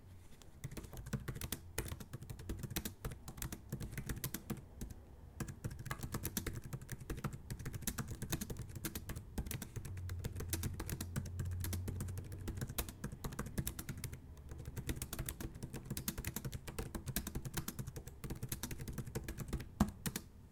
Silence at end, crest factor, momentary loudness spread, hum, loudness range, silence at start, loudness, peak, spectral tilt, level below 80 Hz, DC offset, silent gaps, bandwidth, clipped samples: 0 s; 26 dB; 8 LU; none; 3 LU; 0 s; -45 LUFS; -18 dBFS; -4.5 dB/octave; -52 dBFS; under 0.1%; none; 18 kHz; under 0.1%